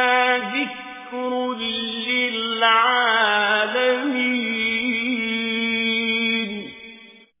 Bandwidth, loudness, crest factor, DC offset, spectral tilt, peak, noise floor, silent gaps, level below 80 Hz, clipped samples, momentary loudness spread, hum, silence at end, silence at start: 3.9 kHz; -20 LUFS; 18 dB; under 0.1%; -6.5 dB/octave; -4 dBFS; -46 dBFS; none; -62 dBFS; under 0.1%; 12 LU; none; 0.3 s; 0 s